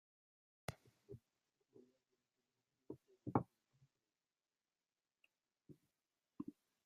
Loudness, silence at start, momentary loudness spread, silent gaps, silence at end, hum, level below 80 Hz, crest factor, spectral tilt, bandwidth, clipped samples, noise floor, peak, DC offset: -49 LUFS; 0.7 s; 25 LU; none; 0.35 s; none; -82 dBFS; 34 dB; -7.5 dB/octave; 13.5 kHz; under 0.1%; under -90 dBFS; -20 dBFS; under 0.1%